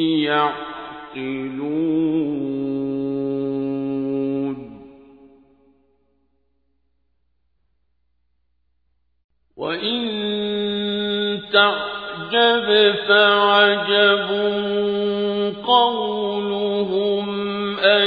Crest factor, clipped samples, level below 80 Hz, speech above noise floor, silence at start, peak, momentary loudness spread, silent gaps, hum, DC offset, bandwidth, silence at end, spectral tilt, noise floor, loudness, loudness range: 20 dB; under 0.1%; -60 dBFS; 52 dB; 0 s; 0 dBFS; 12 LU; 9.24-9.29 s; none; under 0.1%; 5 kHz; 0 s; -7 dB/octave; -71 dBFS; -19 LUFS; 13 LU